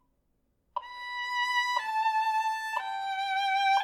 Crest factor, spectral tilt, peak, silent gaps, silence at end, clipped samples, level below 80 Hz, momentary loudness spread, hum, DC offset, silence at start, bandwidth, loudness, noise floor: 16 dB; 3 dB/octave; -14 dBFS; none; 0 s; under 0.1%; -76 dBFS; 11 LU; none; under 0.1%; 0.75 s; 17 kHz; -29 LUFS; -74 dBFS